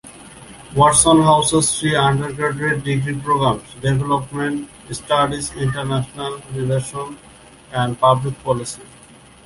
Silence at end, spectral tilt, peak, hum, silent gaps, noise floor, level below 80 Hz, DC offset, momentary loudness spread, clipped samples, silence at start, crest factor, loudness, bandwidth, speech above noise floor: 0.6 s; -4.5 dB/octave; 0 dBFS; none; none; -45 dBFS; -44 dBFS; under 0.1%; 17 LU; under 0.1%; 0.05 s; 18 dB; -18 LUFS; 11.5 kHz; 27 dB